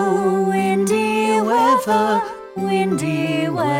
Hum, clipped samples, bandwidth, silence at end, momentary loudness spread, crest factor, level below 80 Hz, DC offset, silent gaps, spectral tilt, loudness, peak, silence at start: none; under 0.1%; 16.5 kHz; 0 s; 6 LU; 14 dB; -60 dBFS; under 0.1%; none; -5.5 dB/octave; -18 LUFS; -4 dBFS; 0 s